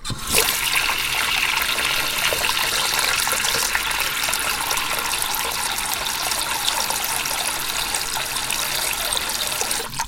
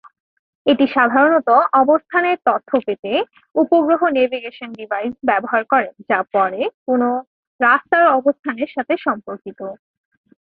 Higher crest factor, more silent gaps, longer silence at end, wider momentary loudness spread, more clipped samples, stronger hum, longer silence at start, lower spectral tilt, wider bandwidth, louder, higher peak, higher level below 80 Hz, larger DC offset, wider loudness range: about the same, 22 dB vs 18 dB; second, none vs 2.99-3.03 s, 6.74-6.86 s, 7.27-7.59 s, 8.39-8.43 s; second, 0 s vs 0.65 s; second, 4 LU vs 12 LU; neither; neither; second, 0 s vs 0.65 s; second, 0 dB/octave vs -8 dB/octave; first, 17 kHz vs 5 kHz; second, -20 LUFS vs -17 LUFS; about the same, -2 dBFS vs 0 dBFS; first, -42 dBFS vs -64 dBFS; neither; about the same, 3 LU vs 3 LU